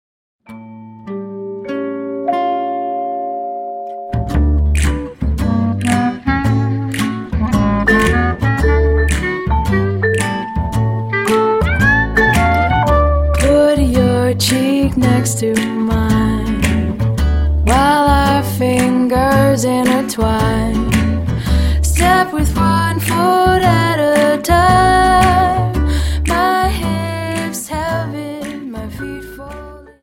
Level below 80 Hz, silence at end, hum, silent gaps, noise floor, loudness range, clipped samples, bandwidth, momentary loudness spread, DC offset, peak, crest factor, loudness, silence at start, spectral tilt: -22 dBFS; 0.15 s; none; none; -34 dBFS; 6 LU; under 0.1%; 16.5 kHz; 12 LU; under 0.1%; 0 dBFS; 14 dB; -14 LUFS; 0.5 s; -5.5 dB/octave